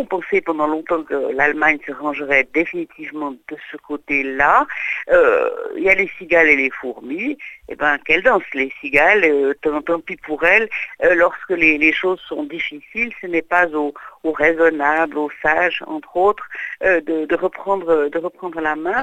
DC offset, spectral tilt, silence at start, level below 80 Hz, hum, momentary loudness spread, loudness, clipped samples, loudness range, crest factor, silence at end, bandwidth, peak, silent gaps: under 0.1%; -5 dB/octave; 0 s; -50 dBFS; none; 13 LU; -17 LUFS; under 0.1%; 4 LU; 18 dB; 0 s; 9 kHz; 0 dBFS; none